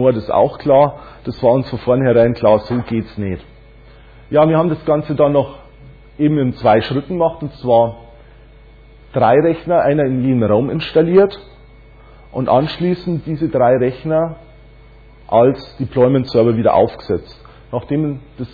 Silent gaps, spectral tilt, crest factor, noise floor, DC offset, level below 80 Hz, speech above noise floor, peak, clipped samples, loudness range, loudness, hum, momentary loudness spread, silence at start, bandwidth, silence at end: none; -10 dB/octave; 14 dB; -42 dBFS; under 0.1%; -42 dBFS; 27 dB; -2 dBFS; under 0.1%; 3 LU; -15 LUFS; none; 11 LU; 0 s; 4.9 kHz; 0.05 s